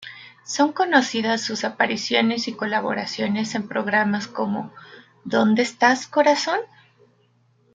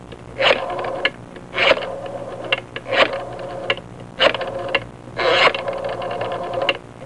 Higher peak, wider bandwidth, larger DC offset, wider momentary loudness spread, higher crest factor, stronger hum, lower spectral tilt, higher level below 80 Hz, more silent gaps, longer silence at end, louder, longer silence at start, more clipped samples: about the same, -2 dBFS vs -2 dBFS; second, 9.4 kHz vs 11 kHz; second, under 0.1% vs 0.4%; second, 10 LU vs 14 LU; about the same, 20 dB vs 18 dB; second, none vs 60 Hz at -45 dBFS; about the same, -4 dB/octave vs -3.5 dB/octave; second, -70 dBFS vs -50 dBFS; neither; first, 1.1 s vs 0 s; about the same, -21 LUFS vs -20 LUFS; about the same, 0 s vs 0 s; neither